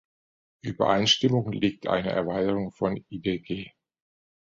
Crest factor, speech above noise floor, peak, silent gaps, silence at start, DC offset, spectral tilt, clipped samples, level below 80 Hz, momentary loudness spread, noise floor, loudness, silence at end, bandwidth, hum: 20 dB; over 64 dB; -8 dBFS; none; 0.65 s; under 0.1%; -5 dB/octave; under 0.1%; -56 dBFS; 15 LU; under -90 dBFS; -26 LUFS; 0.75 s; 7.8 kHz; none